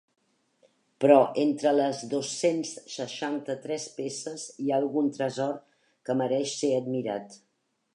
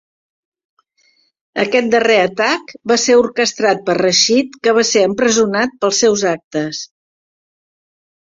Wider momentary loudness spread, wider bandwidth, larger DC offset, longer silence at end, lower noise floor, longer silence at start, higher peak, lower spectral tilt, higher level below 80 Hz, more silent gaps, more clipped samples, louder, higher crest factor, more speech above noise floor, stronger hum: first, 14 LU vs 9 LU; first, 11 kHz vs 7.8 kHz; neither; second, 0.6 s vs 1.45 s; first, -67 dBFS vs -58 dBFS; second, 1 s vs 1.55 s; second, -6 dBFS vs 0 dBFS; first, -4.5 dB/octave vs -2.5 dB/octave; second, -82 dBFS vs -58 dBFS; second, none vs 6.44-6.51 s; neither; second, -28 LUFS vs -14 LUFS; first, 22 dB vs 16 dB; second, 40 dB vs 44 dB; neither